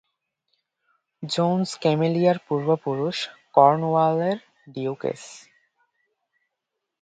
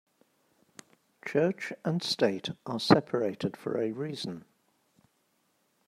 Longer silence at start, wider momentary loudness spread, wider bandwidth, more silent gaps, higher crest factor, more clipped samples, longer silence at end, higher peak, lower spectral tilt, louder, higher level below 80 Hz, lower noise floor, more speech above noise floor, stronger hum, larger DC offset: about the same, 1.2 s vs 1.25 s; about the same, 14 LU vs 13 LU; second, 9.2 kHz vs 15 kHz; neither; about the same, 24 dB vs 28 dB; neither; first, 1.65 s vs 1.45 s; about the same, -2 dBFS vs -4 dBFS; about the same, -6.5 dB/octave vs -5.5 dB/octave; first, -23 LUFS vs -30 LUFS; about the same, -70 dBFS vs -70 dBFS; first, -82 dBFS vs -73 dBFS; first, 60 dB vs 44 dB; neither; neither